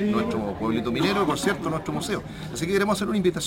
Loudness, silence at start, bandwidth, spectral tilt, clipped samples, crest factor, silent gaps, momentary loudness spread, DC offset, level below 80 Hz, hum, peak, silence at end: -25 LUFS; 0 s; 16.5 kHz; -5 dB/octave; under 0.1%; 16 dB; none; 7 LU; under 0.1%; -48 dBFS; none; -8 dBFS; 0 s